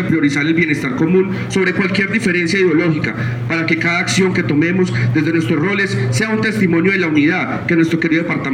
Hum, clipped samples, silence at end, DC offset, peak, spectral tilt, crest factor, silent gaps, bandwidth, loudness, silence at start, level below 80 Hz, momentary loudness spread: none; under 0.1%; 0 s; under 0.1%; -2 dBFS; -6 dB/octave; 12 dB; none; 13 kHz; -15 LUFS; 0 s; -50 dBFS; 3 LU